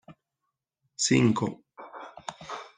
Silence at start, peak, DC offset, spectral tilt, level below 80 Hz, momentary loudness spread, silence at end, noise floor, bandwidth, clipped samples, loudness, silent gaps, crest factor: 0.1 s; -8 dBFS; under 0.1%; -4.5 dB/octave; -66 dBFS; 23 LU; 0.1 s; -84 dBFS; 9.8 kHz; under 0.1%; -26 LUFS; none; 22 dB